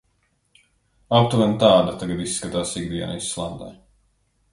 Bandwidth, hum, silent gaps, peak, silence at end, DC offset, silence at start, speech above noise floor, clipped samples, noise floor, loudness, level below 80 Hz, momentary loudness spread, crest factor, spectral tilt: 11.5 kHz; none; none; 0 dBFS; 0.8 s; under 0.1%; 1.1 s; 46 dB; under 0.1%; -67 dBFS; -21 LUFS; -50 dBFS; 14 LU; 22 dB; -5 dB/octave